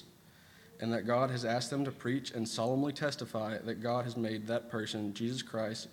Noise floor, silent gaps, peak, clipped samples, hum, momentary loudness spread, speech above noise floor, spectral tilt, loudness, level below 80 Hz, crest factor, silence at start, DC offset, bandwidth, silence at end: -60 dBFS; none; -16 dBFS; under 0.1%; none; 6 LU; 25 dB; -5.5 dB/octave; -35 LUFS; -76 dBFS; 18 dB; 0 s; under 0.1%; 19 kHz; 0 s